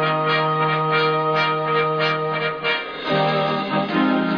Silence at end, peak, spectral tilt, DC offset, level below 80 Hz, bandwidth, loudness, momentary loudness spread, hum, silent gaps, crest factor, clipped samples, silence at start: 0 s; -6 dBFS; -7 dB/octave; under 0.1%; -60 dBFS; 5.4 kHz; -20 LUFS; 4 LU; none; none; 14 dB; under 0.1%; 0 s